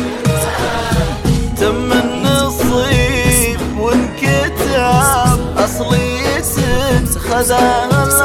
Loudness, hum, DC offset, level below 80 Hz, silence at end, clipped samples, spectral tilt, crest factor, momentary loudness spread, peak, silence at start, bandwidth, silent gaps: -14 LUFS; none; under 0.1%; -24 dBFS; 0 s; under 0.1%; -4.5 dB/octave; 14 dB; 5 LU; 0 dBFS; 0 s; 17.5 kHz; none